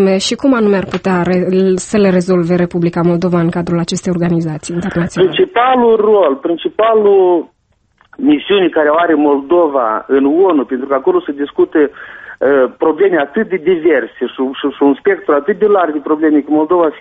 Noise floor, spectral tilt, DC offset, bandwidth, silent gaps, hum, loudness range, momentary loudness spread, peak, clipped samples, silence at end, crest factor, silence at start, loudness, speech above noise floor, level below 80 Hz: -54 dBFS; -6.5 dB/octave; under 0.1%; 8.8 kHz; none; none; 2 LU; 7 LU; 0 dBFS; under 0.1%; 0 s; 12 dB; 0 s; -12 LUFS; 42 dB; -48 dBFS